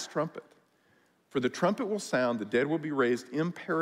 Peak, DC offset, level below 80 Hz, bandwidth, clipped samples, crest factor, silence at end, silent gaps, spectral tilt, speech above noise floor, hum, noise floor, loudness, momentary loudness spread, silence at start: -14 dBFS; under 0.1%; -76 dBFS; 15.5 kHz; under 0.1%; 16 dB; 0 s; none; -5.5 dB/octave; 38 dB; none; -67 dBFS; -30 LUFS; 6 LU; 0 s